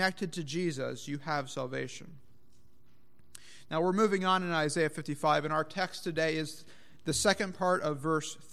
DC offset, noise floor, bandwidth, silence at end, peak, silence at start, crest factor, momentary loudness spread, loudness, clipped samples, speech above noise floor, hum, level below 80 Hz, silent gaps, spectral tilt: 0.4%; -67 dBFS; 15 kHz; 0.2 s; -12 dBFS; 0 s; 20 dB; 12 LU; -32 LUFS; under 0.1%; 36 dB; none; -66 dBFS; none; -4 dB/octave